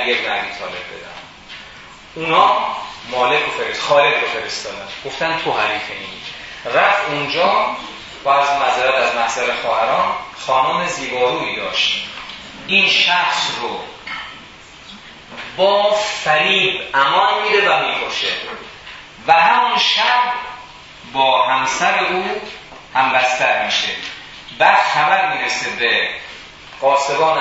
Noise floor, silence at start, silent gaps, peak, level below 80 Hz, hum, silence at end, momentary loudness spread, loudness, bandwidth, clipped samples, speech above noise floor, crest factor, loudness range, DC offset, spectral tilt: -39 dBFS; 0 s; none; 0 dBFS; -54 dBFS; none; 0 s; 19 LU; -16 LUFS; 8 kHz; under 0.1%; 23 dB; 18 dB; 3 LU; under 0.1%; -2 dB/octave